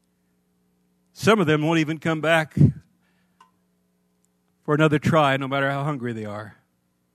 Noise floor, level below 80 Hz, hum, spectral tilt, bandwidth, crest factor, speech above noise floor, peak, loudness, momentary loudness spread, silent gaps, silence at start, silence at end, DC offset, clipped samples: -69 dBFS; -54 dBFS; 60 Hz at -50 dBFS; -6.5 dB/octave; 13.5 kHz; 22 dB; 49 dB; -2 dBFS; -21 LUFS; 16 LU; none; 1.2 s; 0.65 s; under 0.1%; under 0.1%